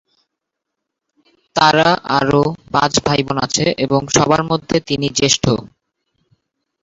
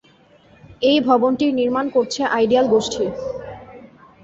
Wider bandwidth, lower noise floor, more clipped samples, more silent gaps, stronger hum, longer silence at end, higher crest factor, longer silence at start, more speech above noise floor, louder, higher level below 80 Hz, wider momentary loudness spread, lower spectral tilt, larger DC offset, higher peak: about the same, 8 kHz vs 8 kHz; first, -79 dBFS vs -52 dBFS; neither; neither; neither; first, 1.15 s vs 0.4 s; about the same, 16 dB vs 16 dB; first, 1.55 s vs 0.7 s; first, 64 dB vs 34 dB; first, -15 LUFS vs -18 LUFS; first, -46 dBFS vs -54 dBFS; second, 5 LU vs 14 LU; about the same, -4 dB/octave vs -4.5 dB/octave; neither; first, 0 dBFS vs -4 dBFS